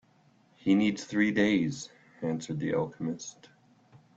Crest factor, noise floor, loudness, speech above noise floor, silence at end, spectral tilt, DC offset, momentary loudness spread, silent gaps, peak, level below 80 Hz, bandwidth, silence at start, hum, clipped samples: 18 dB; -64 dBFS; -29 LUFS; 35 dB; 0.85 s; -5.5 dB/octave; under 0.1%; 15 LU; none; -14 dBFS; -66 dBFS; 8 kHz; 0.65 s; none; under 0.1%